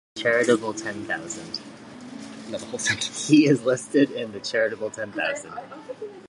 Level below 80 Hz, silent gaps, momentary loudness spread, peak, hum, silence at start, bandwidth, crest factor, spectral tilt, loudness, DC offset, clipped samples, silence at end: -66 dBFS; none; 19 LU; -4 dBFS; none; 0.15 s; 11.5 kHz; 20 dB; -4 dB/octave; -24 LUFS; under 0.1%; under 0.1%; 0 s